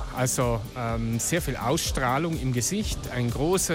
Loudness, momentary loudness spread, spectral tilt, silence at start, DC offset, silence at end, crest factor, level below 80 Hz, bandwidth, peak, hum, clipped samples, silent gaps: -26 LUFS; 5 LU; -4.5 dB/octave; 0 s; under 0.1%; 0 s; 14 dB; -38 dBFS; 16.5 kHz; -12 dBFS; none; under 0.1%; none